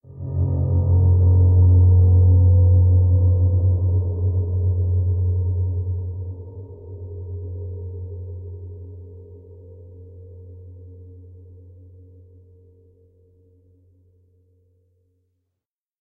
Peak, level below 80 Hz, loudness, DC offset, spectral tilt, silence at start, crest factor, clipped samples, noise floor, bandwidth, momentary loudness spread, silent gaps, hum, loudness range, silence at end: -8 dBFS; -34 dBFS; -18 LUFS; under 0.1%; -16.5 dB/octave; 0.15 s; 12 dB; under 0.1%; -84 dBFS; 1.1 kHz; 23 LU; none; none; 23 LU; 4.8 s